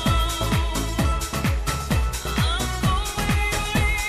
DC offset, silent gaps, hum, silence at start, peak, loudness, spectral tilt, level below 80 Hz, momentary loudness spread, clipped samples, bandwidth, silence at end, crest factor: under 0.1%; none; none; 0 s; -10 dBFS; -23 LUFS; -4 dB/octave; -26 dBFS; 2 LU; under 0.1%; 15.5 kHz; 0 s; 12 dB